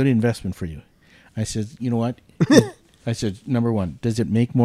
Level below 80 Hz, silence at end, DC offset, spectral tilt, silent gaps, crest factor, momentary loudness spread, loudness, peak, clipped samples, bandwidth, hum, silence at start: -48 dBFS; 0 s; under 0.1%; -6.5 dB/octave; none; 20 dB; 17 LU; -22 LUFS; 0 dBFS; under 0.1%; 13.5 kHz; none; 0 s